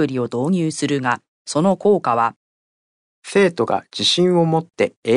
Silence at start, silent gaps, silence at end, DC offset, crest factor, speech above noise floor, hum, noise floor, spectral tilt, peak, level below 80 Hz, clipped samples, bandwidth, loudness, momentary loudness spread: 0 s; 1.28-1.45 s, 2.36-3.22 s, 4.97-5.02 s; 0 s; under 0.1%; 14 dB; over 72 dB; none; under -90 dBFS; -5 dB/octave; -4 dBFS; -66 dBFS; under 0.1%; 10.5 kHz; -19 LUFS; 7 LU